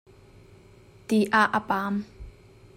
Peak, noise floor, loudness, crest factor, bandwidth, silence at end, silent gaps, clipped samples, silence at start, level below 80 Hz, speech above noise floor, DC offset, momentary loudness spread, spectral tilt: -8 dBFS; -53 dBFS; -24 LUFS; 20 dB; 16 kHz; 0.45 s; none; under 0.1%; 1.1 s; -54 dBFS; 29 dB; under 0.1%; 19 LU; -5.5 dB/octave